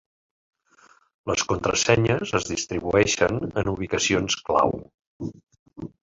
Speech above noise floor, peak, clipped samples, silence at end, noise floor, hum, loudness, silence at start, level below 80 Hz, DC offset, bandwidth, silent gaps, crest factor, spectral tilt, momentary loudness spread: 34 dB; -2 dBFS; under 0.1%; 0.15 s; -57 dBFS; none; -23 LUFS; 1.25 s; -48 dBFS; under 0.1%; 7.8 kHz; 4.94-4.98 s, 5.07-5.20 s, 5.59-5.66 s; 22 dB; -4 dB/octave; 17 LU